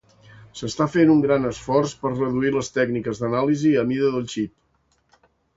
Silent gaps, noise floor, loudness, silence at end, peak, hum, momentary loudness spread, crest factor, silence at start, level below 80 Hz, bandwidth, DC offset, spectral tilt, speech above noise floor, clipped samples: none; -66 dBFS; -21 LUFS; 1.1 s; -6 dBFS; none; 12 LU; 16 dB; 0.4 s; -54 dBFS; 8 kHz; under 0.1%; -6.5 dB/octave; 45 dB; under 0.1%